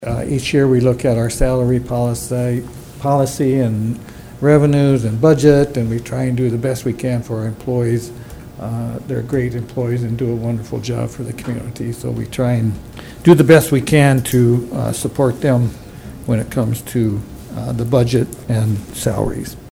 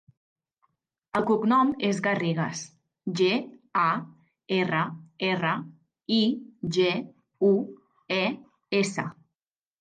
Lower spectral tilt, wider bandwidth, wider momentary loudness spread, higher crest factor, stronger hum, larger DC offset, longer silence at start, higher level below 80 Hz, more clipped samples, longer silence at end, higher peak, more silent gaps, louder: first, -7 dB/octave vs -5.5 dB/octave; first, 16.5 kHz vs 9.8 kHz; about the same, 13 LU vs 14 LU; about the same, 16 dB vs 16 dB; neither; neither; second, 0 s vs 1.15 s; first, -34 dBFS vs -70 dBFS; neither; second, 0 s vs 0.7 s; first, 0 dBFS vs -12 dBFS; neither; first, -17 LUFS vs -26 LUFS